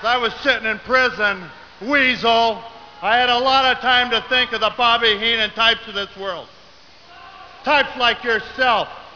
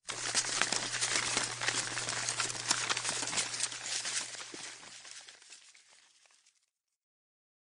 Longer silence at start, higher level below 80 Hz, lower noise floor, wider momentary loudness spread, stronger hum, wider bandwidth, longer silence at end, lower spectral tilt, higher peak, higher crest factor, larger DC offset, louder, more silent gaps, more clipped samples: about the same, 0 s vs 0.05 s; first, -50 dBFS vs -72 dBFS; second, -47 dBFS vs -80 dBFS; second, 12 LU vs 17 LU; neither; second, 5.4 kHz vs 13 kHz; second, 0.05 s vs 1.95 s; first, -3 dB/octave vs 0 dB/octave; first, -2 dBFS vs -8 dBFS; second, 16 dB vs 28 dB; first, 0.2% vs under 0.1%; first, -17 LUFS vs -32 LUFS; neither; neither